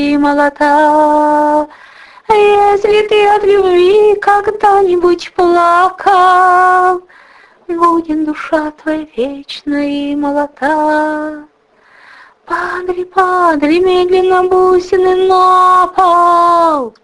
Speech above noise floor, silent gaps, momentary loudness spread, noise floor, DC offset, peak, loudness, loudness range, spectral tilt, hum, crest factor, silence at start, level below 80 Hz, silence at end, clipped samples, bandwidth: 37 dB; none; 10 LU; -47 dBFS; under 0.1%; 0 dBFS; -10 LUFS; 7 LU; -4.5 dB/octave; none; 10 dB; 0 s; -46 dBFS; 0.15 s; under 0.1%; 11.5 kHz